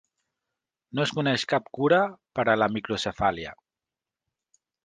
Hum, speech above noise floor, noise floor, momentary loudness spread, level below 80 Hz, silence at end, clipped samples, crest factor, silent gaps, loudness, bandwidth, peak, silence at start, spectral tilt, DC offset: none; 65 dB; -90 dBFS; 8 LU; -58 dBFS; 1.3 s; under 0.1%; 22 dB; none; -25 LUFS; 9.8 kHz; -6 dBFS; 0.95 s; -5 dB/octave; under 0.1%